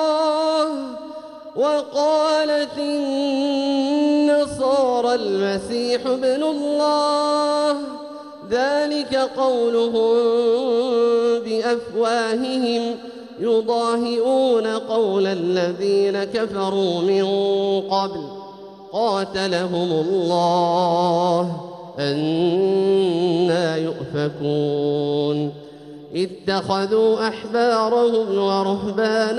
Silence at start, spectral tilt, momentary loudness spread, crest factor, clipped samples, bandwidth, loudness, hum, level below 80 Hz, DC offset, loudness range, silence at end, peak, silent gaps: 0 s; -5.5 dB/octave; 9 LU; 12 dB; under 0.1%; 11.5 kHz; -20 LUFS; none; -60 dBFS; under 0.1%; 3 LU; 0 s; -8 dBFS; none